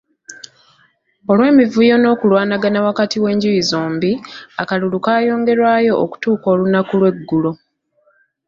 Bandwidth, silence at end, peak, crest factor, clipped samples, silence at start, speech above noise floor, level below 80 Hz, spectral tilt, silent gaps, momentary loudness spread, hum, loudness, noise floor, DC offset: 7.6 kHz; 0.9 s; -2 dBFS; 14 dB; under 0.1%; 0.3 s; 45 dB; -58 dBFS; -6 dB/octave; none; 11 LU; none; -15 LUFS; -60 dBFS; under 0.1%